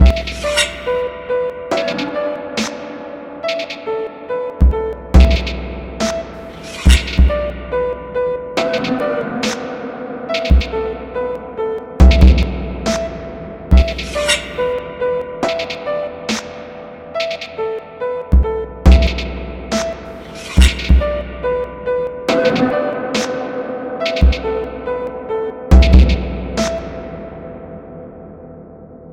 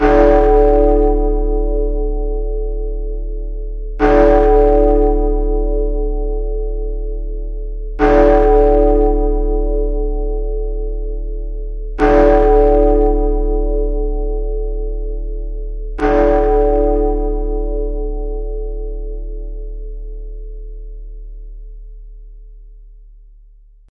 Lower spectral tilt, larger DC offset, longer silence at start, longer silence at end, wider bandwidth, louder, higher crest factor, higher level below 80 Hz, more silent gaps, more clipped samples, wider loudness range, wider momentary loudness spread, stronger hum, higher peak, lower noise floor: second, -5.5 dB/octave vs -9 dB/octave; neither; about the same, 0 s vs 0 s; second, 0 s vs 0.9 s; first, 11.5 kHz vs 3.8 kHz; about the same, -17 LUFS vs -16 LUFS; about the same, 16 dB vs 14 dB; about the same, -18 dBFS vs -18 dBFS; neither; neither; second, 5 LU vs 15 LU; about the same, 17 LU vs 19 LU; neither; about the same, 0 dBFS vs 0 dBFS; second, -37 dBFS vs -43 dBFS